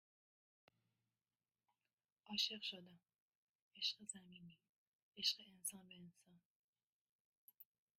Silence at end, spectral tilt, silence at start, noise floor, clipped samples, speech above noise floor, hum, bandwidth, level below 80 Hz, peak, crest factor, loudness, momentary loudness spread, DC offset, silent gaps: 0.35 s; -1 dB/octave; 2.25 s; under -90 dBFS; under 0.1%; over 41 dB; none; 13.5 kHz; under -90 dBFS; -24 dBFS; 28 dB; -44 LUFS; 24 LU; under 0.1%; 3.20-3.71 s, 4.69-5.12 s, 6.45-6.73 s, 6.87-7.48 s